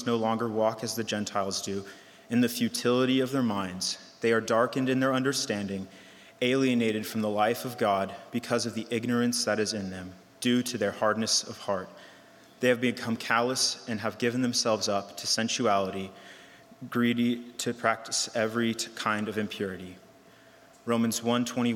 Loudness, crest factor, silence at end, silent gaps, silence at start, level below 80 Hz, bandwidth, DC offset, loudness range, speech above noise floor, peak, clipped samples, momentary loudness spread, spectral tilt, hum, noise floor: -28 LUFS; 20 dB; 0 s; none; 0 s; -76 dBFS; 17 kHz; under 0.1%; 3 LU; 27 dB; -10 dBFS; under 0.1%; 9 LU; -3.5 dB/octave; none; -55 dBFS